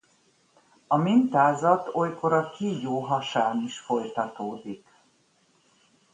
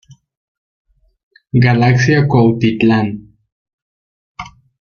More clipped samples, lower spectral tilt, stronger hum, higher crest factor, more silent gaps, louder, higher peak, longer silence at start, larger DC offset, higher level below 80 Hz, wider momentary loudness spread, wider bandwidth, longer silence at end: neither; about the same, -6.5 dB/octave vs -7.5 dB/octave; neither; first, 20 dB vs 14 dB; second, none vs 3.52-3.65 s, 3.73-4.35 s; second, -25 LUFS vs -13 LUFS; second, -6 dBFS vs -2 dBFS; second, 0.9 s vs 1.55 s; neither; second, -72 dBFS vs -46 dBFS; second, 13 LU vs 21 LU; first, 9.6 kHz vs 6.8 kHz; first, 1.35 s vs 0.45 s